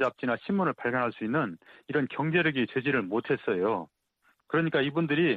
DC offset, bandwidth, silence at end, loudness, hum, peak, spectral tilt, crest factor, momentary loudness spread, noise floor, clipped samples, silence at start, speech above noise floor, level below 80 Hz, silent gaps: under 0.1%; 7.2 kHz; 0 s; -29 LUFS; none; -14 dBFS; -8.5 dB/octave; 16 dB; 6 LU; -70 dBFS; under 0.1%; 0 s; 42 dB; -68 dBFS; none